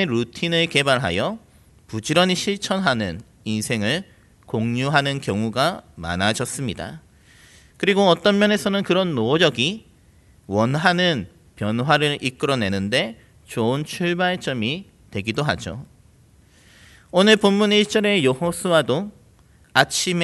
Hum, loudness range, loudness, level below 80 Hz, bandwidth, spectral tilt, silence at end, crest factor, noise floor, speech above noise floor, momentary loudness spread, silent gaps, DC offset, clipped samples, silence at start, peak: none; 5 LU; -20 LUFS; -54 dBFS; 12 kHz; -4.5 dB/octave; 0 s; 22 dB; -53 dBFS; 33 dB; 12 LU; none; under 0.1%; under 0.1%; 0 s; 0 dBFS